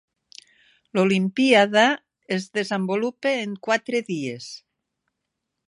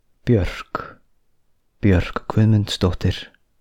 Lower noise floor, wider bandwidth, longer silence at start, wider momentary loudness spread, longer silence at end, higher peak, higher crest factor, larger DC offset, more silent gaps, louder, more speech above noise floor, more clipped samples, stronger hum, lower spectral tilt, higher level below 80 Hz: first, -81 dBFS vs -60 dBFS; about the same, 11.5 kHz vs 11 kHz; first, 0.95 s vs 0.25 s; about the same, 14 LU vs 14 LU; first, 1.1 s vs 0.35 s; about the same, -2 dBFS vs -4 dBFS; first, 22 dB vs 16 dB; neither; neither; about the same, -22 LUFS vs -21 LUFS; first, 59 dB vs 42 dB; neither; neither; second, -5 dB/octave vs -7 dB/octave; second, -72 dBFS vs -36 dBFS